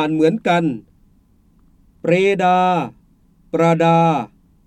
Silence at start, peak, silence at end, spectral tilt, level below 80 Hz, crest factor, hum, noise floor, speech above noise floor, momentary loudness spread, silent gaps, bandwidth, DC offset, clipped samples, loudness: 0 s; -2 dBFS; 0.4 s; -7 dB/octave; -56 dBFS; 16 dB; none; -54 dBFS; 39 dB; 12 LU; none; 9.4 kHz; under 0.1%; under 0.1%; -17 LUFS